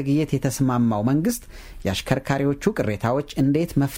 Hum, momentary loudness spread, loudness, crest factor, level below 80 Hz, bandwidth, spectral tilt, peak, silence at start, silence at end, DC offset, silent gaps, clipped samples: none; 6 LU; -23 LUFS; 16 dB; -42 dBFS; 17 kHz; -6.5 dB/octave; -6 dBFS; 0 s; 0 s; under 0.1%; none; under 0.1%